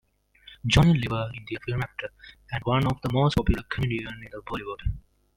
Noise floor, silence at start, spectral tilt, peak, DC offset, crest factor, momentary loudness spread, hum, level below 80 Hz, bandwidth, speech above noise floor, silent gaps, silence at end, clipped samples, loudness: -54 dBFS; 0.5 s; -6 dB/octave; -6 dBFS; under 0.1%; 22 dB; 16 LU; none; -38 dBFS; 15.5 kHz; 28 dB; none; 0.4 s; under 0.1%; -26 LUFS